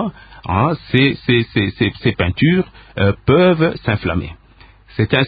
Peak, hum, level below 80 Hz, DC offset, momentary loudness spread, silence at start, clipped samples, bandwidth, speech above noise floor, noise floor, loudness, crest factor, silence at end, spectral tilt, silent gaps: 0 dBFS; none; -34 dBFS; under 0.1%; 12 LU; 0 s; under 0.1%; 5 kHz; 30 dB; -46 dBFS; -16 LUFS; 16 dB; 0 s; -10 dB/octave; none